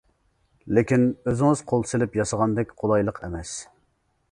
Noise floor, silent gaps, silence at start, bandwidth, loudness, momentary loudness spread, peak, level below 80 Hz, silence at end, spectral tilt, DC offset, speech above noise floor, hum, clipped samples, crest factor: -69 dBFS; none; 0.65 s; 11 kHz; -24 LUFS; 12 LU; -4 dBFS; -48 dBFS; 0.7 s; -6.5 dB/octave; under 0.1%; 46 dB; none; under 0.1%; 20 dB